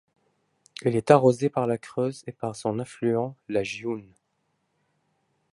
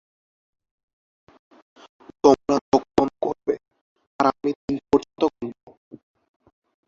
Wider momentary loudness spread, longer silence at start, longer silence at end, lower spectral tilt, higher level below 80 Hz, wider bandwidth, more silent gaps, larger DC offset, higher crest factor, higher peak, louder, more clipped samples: first, 15 LU vs 11 LU; second, 0.85 s vs 2.25 s; first, 1.5 s vs 1.35 s; about the same, -6.5 dB/octave vs -6 dB/octave; second, -66 dBFS vs -56 dBFS; first, 11.5 kHz vs 7.6 kHz; second, none vs 2.61-2.72 s, 3.81-3.96 s, 4.07-4.19 s, 4.56-4.68 s; neither; about the same, 24 dB vs 24 dB; about the same, -2 dBFS vs -2 dBFS; second, -26 LUFS vs -22 LUFS; neither